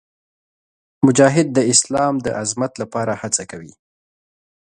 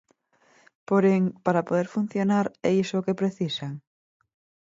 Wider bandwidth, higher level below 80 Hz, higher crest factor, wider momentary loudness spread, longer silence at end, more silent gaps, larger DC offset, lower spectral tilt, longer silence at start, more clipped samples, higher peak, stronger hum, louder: first, 11 kHz vs 7.8 kHz; first, -54 dBFS vs -70 dBFS; about the same, 20 dB vs 18 dB; about the same, 10 LU vs 8 LU; about the same, 1.1 s vs 1 s; neither; neither; second, -4 dB/octave vs -7 dB/octave; about the same, 1 s vs 0.9 s; neither; first, 0 dBFS vs -8 dBFS; neither; first, -17 LUFS vs -25 LUFS